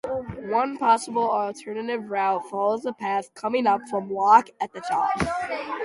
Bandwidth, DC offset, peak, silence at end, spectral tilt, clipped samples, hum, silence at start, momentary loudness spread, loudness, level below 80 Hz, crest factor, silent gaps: 11.5 kHz; under 0.1%; -4 dBFS; 0 s; -5 dB/octave; under 0.1%; none; 0.05 s; 12 LU; -24 LUFS; -54 dBFS; 20 dB; none